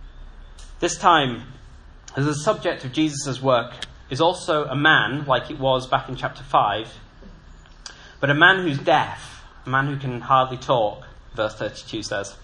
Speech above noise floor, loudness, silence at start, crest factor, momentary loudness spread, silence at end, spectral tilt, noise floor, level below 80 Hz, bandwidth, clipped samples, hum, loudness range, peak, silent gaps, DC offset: 24 dB; -21 LUFS; 0 s; 22 dB; 19 LU; 0 s; -4.5 dB/octave; -45 dBFS; -46 dBFS; 11 kHz; under 0.1%; none; 4 LU; 0 dBFS; none; under 0.1%